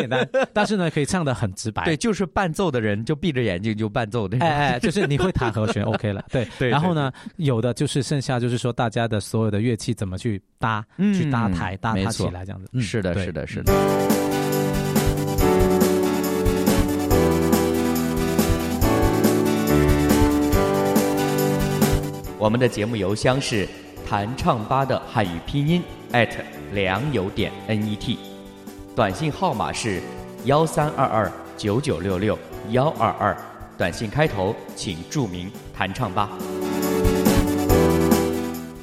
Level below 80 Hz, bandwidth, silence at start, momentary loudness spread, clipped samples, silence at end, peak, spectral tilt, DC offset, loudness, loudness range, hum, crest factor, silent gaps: -36 dBFS; 16.5 kHz; 0 s; 8 LU; under 0.1%; 0 s; -4 dBFS; -6 dB/octave; under 0.1%; -22 LUFS; 5 LU; none; 18 dB; none